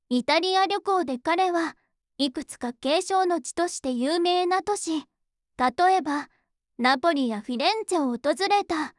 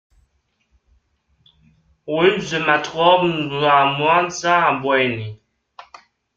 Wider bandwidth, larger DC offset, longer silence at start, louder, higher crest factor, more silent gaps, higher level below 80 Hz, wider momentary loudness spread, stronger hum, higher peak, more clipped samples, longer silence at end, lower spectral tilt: first, 12 kHz vs 7.8 kHz; neither; second, 0.1 s vs 2.05 s; second, -25 LUFS vs -17 LUFS; about the same, 16 dB vs 18 dB; neither; second, -66 dBFS vs -58 dBFS; about the same, 8 LU vs 9 LU; neither; second, -10 dBFS vs -2 dBFS; neither; second, 0.1 s vs 1 s; second, -2.5 dB/octave vs -4.5 dB/octave